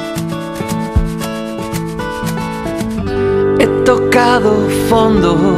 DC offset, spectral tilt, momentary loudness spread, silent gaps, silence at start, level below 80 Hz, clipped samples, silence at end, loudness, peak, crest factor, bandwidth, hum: under 0.1%; -6 dB/octave; 10 LU; none; 0 s; -28 dBFS; under 0.1%; 0 s; -14 LUFS; 0 dBFS; 14 dB; 15.5 kHz; none